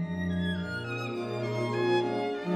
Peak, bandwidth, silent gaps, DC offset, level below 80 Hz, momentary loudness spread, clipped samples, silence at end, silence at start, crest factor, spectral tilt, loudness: -16 dBFS; 11.5 kHz; none; under 0.1%; -58 dBFS; 6 LU; under 0.1%; 0 s; 0 s; 14 dB; -7 dB/octave; -31 LUFS